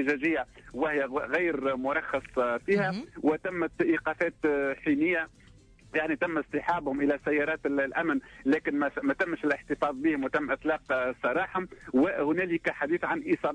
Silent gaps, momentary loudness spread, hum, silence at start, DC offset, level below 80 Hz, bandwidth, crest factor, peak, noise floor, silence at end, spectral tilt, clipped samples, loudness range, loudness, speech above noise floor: none; 4 LU; none; 0 s; under 0.1%; -60 dBFS; 9.8 kHz; 14 dB; -16 dBFS; -55 dBFS; 0 s; -7 dB/octave; under 0.1%; 1 LU; -29 LUFS; 27 dB